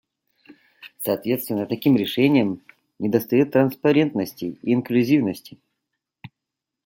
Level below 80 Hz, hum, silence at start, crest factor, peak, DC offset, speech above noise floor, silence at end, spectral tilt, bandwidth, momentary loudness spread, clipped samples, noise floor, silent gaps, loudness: -66 dBFS; none; 0.5 s; 18 dB; -4 dBFS; under 0.1%; 64 dB; 0.6 s; -6.5 dB/octave; 17 kHz; 11 LU; under 0.1%; -84 dBFS; none; -21 LUFS